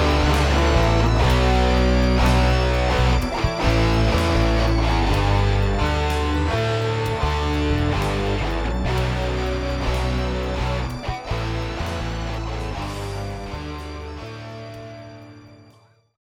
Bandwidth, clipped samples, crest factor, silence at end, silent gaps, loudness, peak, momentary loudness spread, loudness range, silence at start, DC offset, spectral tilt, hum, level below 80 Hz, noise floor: 15 kHz; under 0.1%; 16 dB; 0.7 s; none; -21 LUFS; -6 dBFS; 13 LU; 11 LU; 0 s; under 0.1%; -6 dB/octave; none; -24 dBFS; -54 dBFS